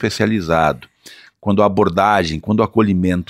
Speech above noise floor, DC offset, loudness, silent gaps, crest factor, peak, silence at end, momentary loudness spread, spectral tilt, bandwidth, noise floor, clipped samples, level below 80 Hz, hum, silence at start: 28 dB; under 0.1%; -16 LUFS; none; 16 dB; 0 dBFS; 0.05 s; 5 LU; -6.5 dB/octave; 14.5 kHz; -43 dBFS; under 0.1%; -42 dBFS; none; 0 s